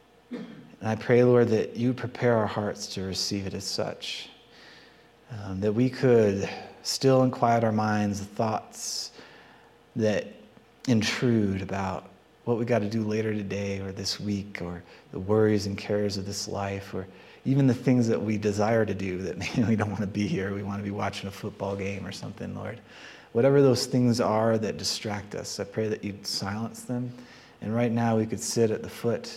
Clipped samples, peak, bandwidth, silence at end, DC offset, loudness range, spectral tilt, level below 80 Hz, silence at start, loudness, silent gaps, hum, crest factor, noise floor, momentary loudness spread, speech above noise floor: under 0.1%; -8 dBFS; 15.5 kHz; 0 s; under 0.1%; 5 LU; -5.5 dB/octave; -64 dBFS; 0.3 s; -27 LUFS; none; none; 20 dB; -55 dBFS; 15 LU; 29 dB